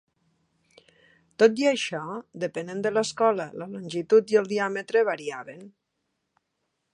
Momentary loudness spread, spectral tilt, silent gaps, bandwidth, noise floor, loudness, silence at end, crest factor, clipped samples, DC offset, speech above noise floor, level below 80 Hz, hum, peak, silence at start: 15 LU; -4.5 dB/octave; none; 10.5 kHz; -78 dBFS; -25 LUFS; 1.25 s; 20 dB; under 0.1%; under 0.1%; 54 dB; -74 dBFS; none; -6 dBFS; 1.4 s